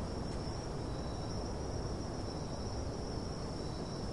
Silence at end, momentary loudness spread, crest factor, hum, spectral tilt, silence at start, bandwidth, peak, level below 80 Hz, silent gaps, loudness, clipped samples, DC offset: 0 s; 1 LU; 14 dB; none; -6 dB/octave; 0 s; 11.5 kHz; -26 dBFS; -46 dBFS; none; -41 LUFS; under 0.1%; 0.2%